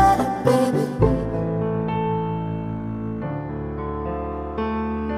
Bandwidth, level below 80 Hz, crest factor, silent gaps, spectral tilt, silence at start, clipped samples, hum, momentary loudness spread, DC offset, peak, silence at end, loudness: 15.5 kHz; -36 dBFS; 18 dB; none; -7.5 dB/octave; 0 s; under 0.1%; none; 9 LU; 0.1%; -4 dBFS; 0 s; -24 LUFS